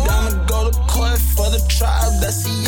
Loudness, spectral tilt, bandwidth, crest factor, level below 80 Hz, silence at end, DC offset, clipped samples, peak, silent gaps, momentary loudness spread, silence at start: -18 LUFS; -4 dB/octave; over 20 kHz; 10 dB; -16 dBFS; 0 s; under 0.1%; under 0.1%; -6 dBFS; none; 2 LU; 0 s